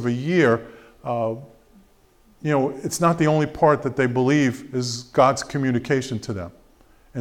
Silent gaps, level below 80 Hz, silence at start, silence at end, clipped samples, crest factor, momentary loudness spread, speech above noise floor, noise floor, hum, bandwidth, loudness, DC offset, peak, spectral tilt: none; -54 dBFS; 0 s; 0 s; under 0.1%; 18 dB; 13 LU; 35 dB; -56 dBFS; none; 16 kHz; -21 LUFS; under 0.1%; -4 dBFS; -6 dB/octave